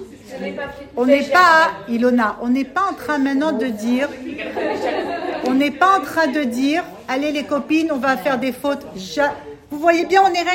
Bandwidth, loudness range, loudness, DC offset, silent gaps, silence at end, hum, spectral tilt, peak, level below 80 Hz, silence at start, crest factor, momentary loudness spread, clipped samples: 16.5 kHz; 4 LU; -18 LUFS; under 0.1%; none; 0 s; none; -4 dB/octave; 0 dBFS; -54 dBFS; 0 s; 18 dB; 13 LU; under 0.1%